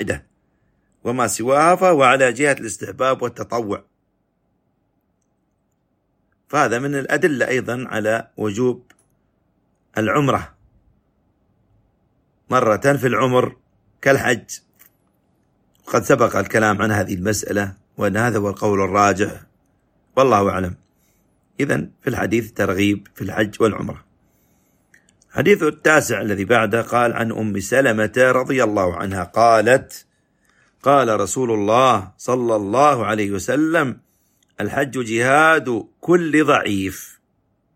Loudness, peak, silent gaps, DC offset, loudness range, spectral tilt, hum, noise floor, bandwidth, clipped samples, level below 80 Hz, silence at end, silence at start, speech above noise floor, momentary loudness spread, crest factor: -18 LUFS; -2 dBFS; none; under 0.1%; 7 LU; -5 dB/octave; none; -68 dBFS; 16.5 kHz; under 0.1%; -54 dBFS; 0.7 s; 0 s; 50 dB; 11 LU; 18 dB